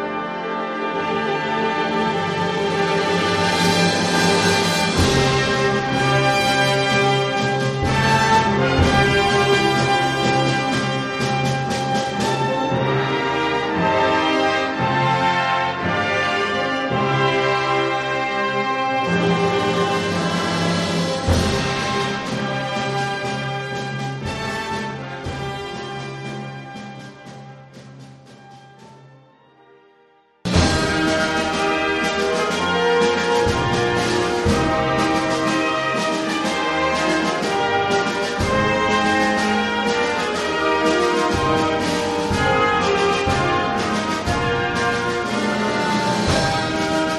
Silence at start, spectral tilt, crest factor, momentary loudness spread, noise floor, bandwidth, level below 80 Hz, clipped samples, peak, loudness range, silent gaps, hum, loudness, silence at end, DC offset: 0 s; -4.5 dB/octave; 16 dB; 8 LU; -55 dBFS; 13 kHz; -40 dBFS; under 0.1%; -2 dBFS; 8 LU; none; none; -19 LUFS; 0 s; under 0.1%